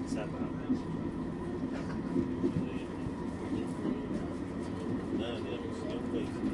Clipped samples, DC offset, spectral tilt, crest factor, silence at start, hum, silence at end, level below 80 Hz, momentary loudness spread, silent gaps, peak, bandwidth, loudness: under 0.1%; under 0.1%; -7.5 dB/octave; 18 dB; 0 s; none; 0 s; -54 dBFS; 5 LU; none; -18 dBFS; 11.5 kHz; -36 LUFS